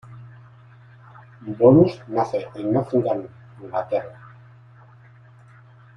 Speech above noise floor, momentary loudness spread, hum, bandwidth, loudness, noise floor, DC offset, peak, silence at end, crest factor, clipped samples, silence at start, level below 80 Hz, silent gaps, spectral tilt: 29 dB; 27 LU; none; 6.8 kHz; -21 LUFS; -49 dBFS; under 0.1%; -2 dBFS; 1.85 s; 22 dB; under 0.1%; 0.1 s; -58 dBFS; none; -9.5 dB/octave